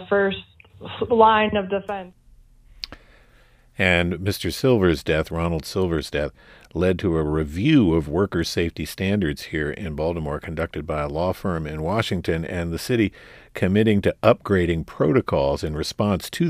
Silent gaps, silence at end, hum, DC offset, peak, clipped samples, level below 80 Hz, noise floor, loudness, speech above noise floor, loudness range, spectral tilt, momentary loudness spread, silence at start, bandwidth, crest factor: none; 0 s; none; under 0.1%; -2 dBFS; under 0.1%; -40 dBFS; -54 dBFS; -22 LUFS; 32 dB; 4 LU; -6.5 dB/octave; 10 LU; 0 s; 15.5 kHz; 20 dB